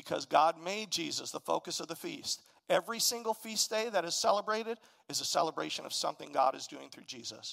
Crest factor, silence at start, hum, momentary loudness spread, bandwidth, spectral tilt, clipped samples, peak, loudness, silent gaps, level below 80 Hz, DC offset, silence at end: 22 dB; 0.05 s; none; 12 LU; 16 kHz; -1.5 dB/octave; under 0.1%; -14 dBFS; -33 LUFS; none; -84 dBFS; under 0.1%; 0 s